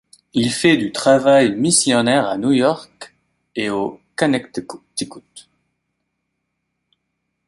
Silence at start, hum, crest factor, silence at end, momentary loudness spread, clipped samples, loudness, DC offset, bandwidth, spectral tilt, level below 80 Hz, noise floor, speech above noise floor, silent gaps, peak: 0.35 s; none; 18 dB; 2.1 s; 16 LU; under 0.1%; -17 LUFS; under 0.1%; 11.5 kHz; -4 dB/octave; -58 dBFS; -75 dBFS; 58 dB; none; 0 dBFS